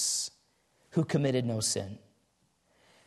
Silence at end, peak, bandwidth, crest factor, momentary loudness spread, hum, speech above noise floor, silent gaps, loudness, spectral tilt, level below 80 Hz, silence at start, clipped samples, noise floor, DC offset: 1.1 s; -16 dBFS; 12.5 kHz; 18 dB; 12 LU; none; 43 dB; none; -31 LUFS; -4 dB/octave; -70 dBFS; 0 s; under 0.1%; -72 dBFS; under 0.1%